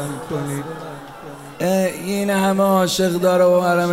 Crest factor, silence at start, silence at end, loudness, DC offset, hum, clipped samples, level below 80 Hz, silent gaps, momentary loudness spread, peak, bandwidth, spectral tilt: 14 dB; 0 s; 0 s; -18 LUFS; 0.2%; none; under 0.1%; -56 dBFS; none; 20 LU; -6 dBFS; 16 kHz; -5.5 dB/octave